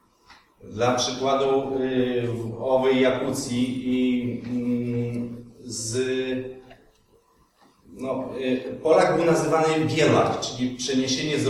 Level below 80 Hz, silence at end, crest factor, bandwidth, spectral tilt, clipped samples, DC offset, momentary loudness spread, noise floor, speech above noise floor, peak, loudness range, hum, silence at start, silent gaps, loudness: -56 dBFS; 0 s; 18 dB; 13.5 kHz; -5 dB/octave; under 0.1%; under 0.1%; 11 LU; -60 dBFS; 37 dB; -6 dBFS; 8 LU; none; 0.3 s; none; -24 LUFS